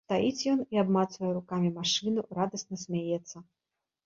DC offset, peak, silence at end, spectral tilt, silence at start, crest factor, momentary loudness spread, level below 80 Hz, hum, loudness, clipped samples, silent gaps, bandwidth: under 0.1%; -14 dBFS; 0.65 s; -5 dB/octave; 0.1 s; 16 dB; 8 LU; -70 dBFS; none; -30 LUFS; under 0.1%; none; 7.8 kHz